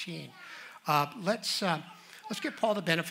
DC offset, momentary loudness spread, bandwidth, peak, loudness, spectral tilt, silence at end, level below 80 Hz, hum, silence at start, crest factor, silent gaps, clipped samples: under 0.1%; 17 LU; 16 kHz; -10 dBFS; -31 LUFS; -4 dB/octave; 0 s; -80 dBFS; none; 0 s; 24 dB; none; under 0.1%